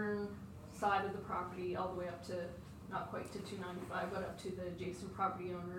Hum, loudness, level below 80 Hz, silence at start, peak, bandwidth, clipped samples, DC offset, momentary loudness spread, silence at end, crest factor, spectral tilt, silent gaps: none; -42 LUFS; -64 dBFS; 0 s; -22 dBFS; 17 kHz; under 0.1%; under 0.1%; 9 LU; 0 s; 20 dB; -6 dB/octave; none